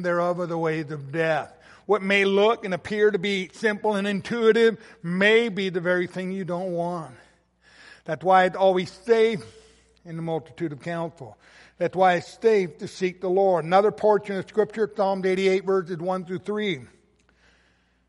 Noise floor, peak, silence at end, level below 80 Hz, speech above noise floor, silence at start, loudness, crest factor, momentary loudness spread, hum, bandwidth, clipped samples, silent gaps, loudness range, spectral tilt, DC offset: -64 dBFS; -6 dBFS; 1.25 s; -66 dBFS; 40 dB; 0 s; -24 LUFS; 18 dB; 12 LU; none; 11.5 kHz; under 0.1%; none; 4 LU; -6 dB/octave; under 0.1%